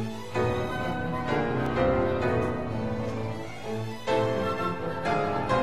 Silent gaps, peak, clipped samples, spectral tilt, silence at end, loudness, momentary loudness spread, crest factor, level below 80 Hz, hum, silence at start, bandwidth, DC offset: none; -12 dBFS; under 0.1%; -7 dB/octave; 0 s; -28 LUFS; 8 LU; 16 dB; -46 dBFS; none; 0 s; 14 kHz; 0.9%